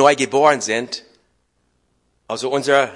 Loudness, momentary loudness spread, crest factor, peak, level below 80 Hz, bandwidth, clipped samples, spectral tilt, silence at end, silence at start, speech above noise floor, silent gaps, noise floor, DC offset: -18 LUFS; 15 LU; 18 dB; 0 dBFS; -66 dBFS; 11.5 kHz; under 0.1%; -3 dB/octave; 0 s; 0 s; 49 dB; none; -66 dBFS; under 0.1%